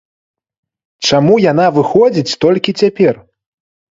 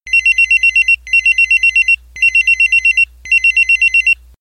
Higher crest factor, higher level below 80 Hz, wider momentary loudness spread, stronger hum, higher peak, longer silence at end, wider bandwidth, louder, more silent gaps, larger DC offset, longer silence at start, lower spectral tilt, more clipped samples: first, 14 dB vs 8 dB; second, -54 dBFS vs -40 dBFS; about the same, 4 LU vs 3 LU; neither; first, 0 dBFS vs -4 dBFS; first, 0.85 s vs 0.25 s; second, 7.8 kHz vs 14.5 kHz; second, -12 LUFS vs -9 LUFS; neither; neither; first, 1 s vs 0.05 s; first, -5.5 dB/octave vs 3 dB/octave; neither